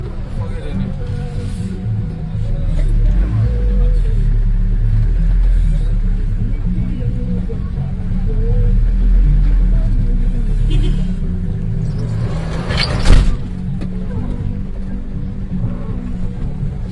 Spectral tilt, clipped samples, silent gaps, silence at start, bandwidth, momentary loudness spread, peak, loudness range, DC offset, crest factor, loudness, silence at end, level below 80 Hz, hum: -7.5 dB/octave; under 0.1%; none; 0 s; 9.4 kHz; 8 LU; 0 dBFS; 3 LU; under 0.1%; 14 dB; -19 LUFS; 0 s; -16 dBFS; none